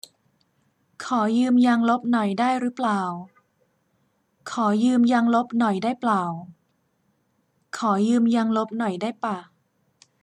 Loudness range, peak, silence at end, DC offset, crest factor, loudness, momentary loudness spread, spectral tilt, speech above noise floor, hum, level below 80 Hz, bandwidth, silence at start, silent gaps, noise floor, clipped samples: 3 LU; -10 dBFS; 0.8 s; under 0.1%; 14 dB; -22 LUFS; 13 LU; -6 dB/octave; 48 dB; none; -74 dBFS; 10.5 kHz; 1 s; none; -69 dBFS; under 0.1%